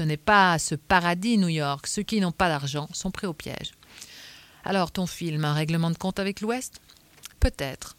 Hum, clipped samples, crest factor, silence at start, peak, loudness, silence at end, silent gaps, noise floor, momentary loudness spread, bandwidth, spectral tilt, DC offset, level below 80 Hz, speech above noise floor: none; under 0.1%; 22 dB; 0 s; -6 dBFS; -25 LUFS; 0.05 s; none; -48 dBFS; 20 LU; 16.5 kHz; -4.5 dB/octave; under 0.1%; -40 dBFS; 22 dB